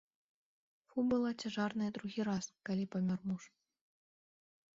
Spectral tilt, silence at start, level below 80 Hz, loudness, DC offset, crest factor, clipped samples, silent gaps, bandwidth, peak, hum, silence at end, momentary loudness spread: -6 dB/octave; 0.95 s; -74 dBFS; -38 LUFS; under 0.1%; 16 dB; under 0.1%; none; 7.6 kHz; -24 dBFS; none; 1.3 s; 7 LU